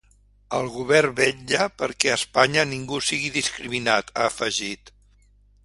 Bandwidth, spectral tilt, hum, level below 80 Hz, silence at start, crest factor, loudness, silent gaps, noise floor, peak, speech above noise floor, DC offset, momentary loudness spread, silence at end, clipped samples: 11.5 kHz; -2.5 dB/octave; 50 Hz at -50 dBFS; -56 dBFS; 0.5 s; 24 dB; -22 LUFS; none; -57 dBFS; 0 dBFS; 34 dB; under 0.1%; 8 LU; 0.75 s; under 0.1%